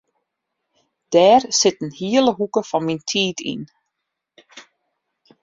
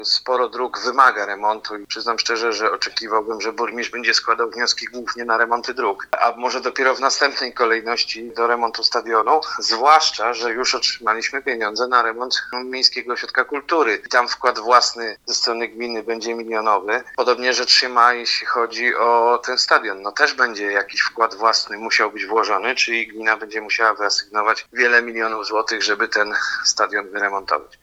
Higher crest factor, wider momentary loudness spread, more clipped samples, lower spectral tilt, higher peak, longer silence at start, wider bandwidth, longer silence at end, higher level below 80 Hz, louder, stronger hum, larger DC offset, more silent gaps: about the same, 20 dB vs 20 dB; first, 15 LU vs 8 LU; neither; first, -3.5 dB/octave vs 0 dB/octave; about the same, -2 dBFS vs 0 dBFS; first, 1.1 s vs 0 s; second, 7.6 kHz vs 14.5 kHz; first, 0.8 s vs 0.2 s; about the same, -64 dBFS vs -62 dBFS; about the same, -18 LUFS vs -18 LUFS; neither; neither; neither